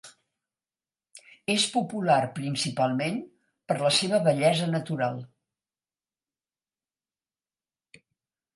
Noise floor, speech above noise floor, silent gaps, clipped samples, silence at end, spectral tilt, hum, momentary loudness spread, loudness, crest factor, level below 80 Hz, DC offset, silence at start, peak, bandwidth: under -90 dBFS; over 64 dB; none; under 0.1%; 3.3 s; -4.5 dB/octave; none; 9 LU; -26 LUFS; 20 dB; -74 dBFS; under 0.1%; 0.05 s; -8 dBFS; 11.5 kHz